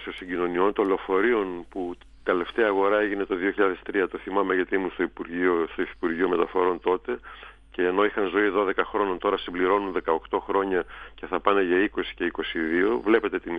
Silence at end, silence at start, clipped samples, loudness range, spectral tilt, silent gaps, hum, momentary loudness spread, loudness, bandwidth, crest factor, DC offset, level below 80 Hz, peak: 0 s; 0 s; under 0.1%; 1 LU; -7.5 dB/octave; none; none; 9 LU; -25 LUFS; 5 kHz; 20 dB; under 0.1%; -52 dBFS; -4 dBFS